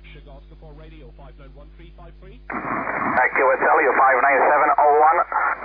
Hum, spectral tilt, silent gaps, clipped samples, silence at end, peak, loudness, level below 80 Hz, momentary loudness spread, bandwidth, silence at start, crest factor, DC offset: none; -9 dB/octave; none; under 0.1%; 0 s; -6 dBFS; -17 LUFS; -46 dBFS; 10 LU; 5 kHz; 0.05 s; 14 dB; under 0.1%